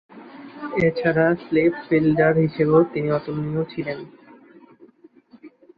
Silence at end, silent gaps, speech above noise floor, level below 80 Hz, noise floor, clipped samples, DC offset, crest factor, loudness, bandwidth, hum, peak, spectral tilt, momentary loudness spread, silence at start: 0.3 s; none; 32 dB; -56 dBFS; -52 dBFS; under 0.1%; under 0.1%; 18 dB; -21 LUFS; 5 kHz; none; -4 dBFS; -10 dB/octave; 14 LU; 0.15 s